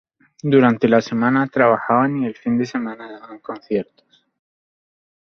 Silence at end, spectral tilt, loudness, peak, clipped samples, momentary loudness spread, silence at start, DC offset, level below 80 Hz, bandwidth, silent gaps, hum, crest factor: 1.4 s; -7.5 dB/octave; -18 LUFS; -2 dBFS; under 0.1%; 19 LU; 0.45 s; under 0.1%; -60 dBFS; 6.6 kHz; none; none; 18 dB